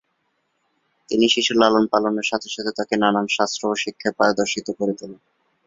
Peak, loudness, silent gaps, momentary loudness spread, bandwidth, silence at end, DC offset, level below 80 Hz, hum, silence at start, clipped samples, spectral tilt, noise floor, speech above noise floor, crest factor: -2 dBFS; -20 LUFS; none; 9 LU; 7.8 kHz; 0.5 s; under 0.1%; -62 dBFS; none; 1.1 s; under 0.1%; -3.5 dB/octave; -71 dBFS; 50 dB; 20 dB